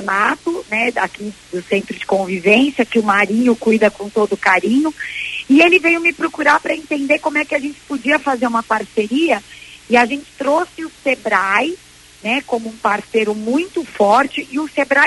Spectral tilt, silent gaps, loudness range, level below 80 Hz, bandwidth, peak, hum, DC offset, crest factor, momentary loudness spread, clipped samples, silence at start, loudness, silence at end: -4.5 dB/octave; none; 4 LU; -54 dBFS; 11.5 kHz; 0 dBFS; none; under 0.1%; 16 dB; 10 LU; under 0.1%; 0 s; -16 LUFS; 0 s